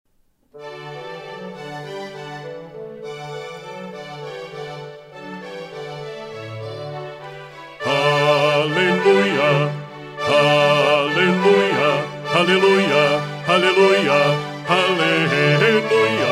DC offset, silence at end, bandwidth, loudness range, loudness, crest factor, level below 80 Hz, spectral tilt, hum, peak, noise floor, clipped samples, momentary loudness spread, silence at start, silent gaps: under 0.1%; 0 s; 15 kHz; 17 LU; -16 LUFS; 16 dB; -62 dBFS; -5 dB/octave; none; -4 dBFS; -61 dBFS; under 0.1%; 19 LU; 0.55 s; none